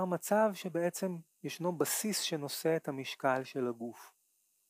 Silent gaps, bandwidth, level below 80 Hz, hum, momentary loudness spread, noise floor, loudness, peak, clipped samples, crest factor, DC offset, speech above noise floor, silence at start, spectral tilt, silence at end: none; 15.5 kHz; under -90 dBFS; none; 10 LU; -75 dBFS; -34 LUFS; -16 dBFS; under 0.1%; 18 dB; under 0.1%; 41 dB; 0 s; -4 dB/octave; 0.6 s